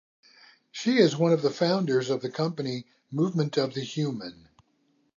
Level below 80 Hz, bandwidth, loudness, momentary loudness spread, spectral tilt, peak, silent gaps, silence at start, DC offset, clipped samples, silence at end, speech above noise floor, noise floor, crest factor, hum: -74 dBFS; 7.4 kHz; -26 LUFS; 15 LU; -6 dB/octave; -8 dBFS; none; 0.75 s; under 0.1%; under 0.1%; 0.85 s; 43 dB; -69 dBFS; 20 dB; none